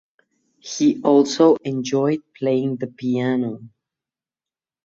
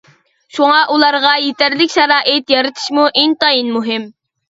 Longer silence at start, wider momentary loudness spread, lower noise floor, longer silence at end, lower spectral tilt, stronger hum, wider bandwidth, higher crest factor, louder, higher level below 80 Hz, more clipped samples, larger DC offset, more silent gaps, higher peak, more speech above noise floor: about the same, 0.65 s vs 0.55 s; first, 13 LU vs 7 LU; first, under -90 dBFS vs -47 dBFS; first, 1.15 s vs 0.4 s; first, -6 dB/octave vs -2.5 dB/octave; neither; about the same, 7.8 kHz vs 8 kHz; about the same, 18 dB vs 14 dB; second, -20 LUFS vs -12 LUFS; second, -66 dBFS vs -60 dBFS; neither; neither; neither; second, -4 dBFS vs 0 dBFS; first, over 71 dB vs 35 dB